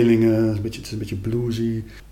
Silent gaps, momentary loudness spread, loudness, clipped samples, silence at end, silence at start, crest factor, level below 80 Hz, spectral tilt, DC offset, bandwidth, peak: none; 12 LU; -23 LUFS; under 0.1%; 0.05 s; 0 s; 14 dB; -44 dBFS; -7.5 dB/octave; under 0.1%; 15.5 kHz; -8 dBFS